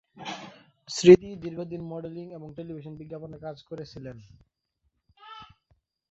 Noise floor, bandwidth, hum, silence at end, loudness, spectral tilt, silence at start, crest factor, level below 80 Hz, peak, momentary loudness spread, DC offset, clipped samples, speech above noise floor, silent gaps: -76 dBFS; 7.6 kHz; none; 0.65 s; -22 LUFS; -6 dB/octave; 0.2 s; 26 dB; -60 dBFS; -2 dBFS; 27 LU; under 0.1%; under 0.1%; 51 dB; none